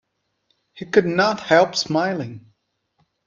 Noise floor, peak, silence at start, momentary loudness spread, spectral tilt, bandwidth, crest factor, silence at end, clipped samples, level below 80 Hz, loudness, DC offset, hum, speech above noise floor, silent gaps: -69 dBFS; -2 dBFS; 0.75 s; 14 LU; -4.5 dB/octave; 7.4 kHz; 20 dB; 0.85 s; under 0.1%; -62 dBFS; -19 LUFS; under 0.1%; none; 50 dB; none